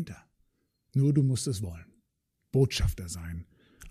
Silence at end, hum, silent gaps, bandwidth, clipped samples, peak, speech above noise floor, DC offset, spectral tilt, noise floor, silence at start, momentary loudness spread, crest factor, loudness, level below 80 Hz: 0 s; none; none; 15 kHz; under 0.1%; -12 dBFS; 52 dB; under 0.1%; -6 dB/octave; -79 dBFS; 0 s; 17 LU; 18 dB; -29 LUFS; -44 dBFS